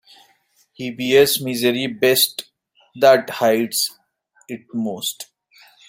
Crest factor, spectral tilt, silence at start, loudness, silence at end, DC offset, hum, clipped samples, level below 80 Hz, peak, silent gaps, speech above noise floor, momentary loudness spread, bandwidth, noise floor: 18 dB; -3 dB/octave; 0.8 s; -18 LUFS; 0.65 s; under 0.1%; none; under 0.1%; -64 dBFS; -2 dBFS; none; 42 dB; 18 LU; 16.5 kHz; -60 dBFS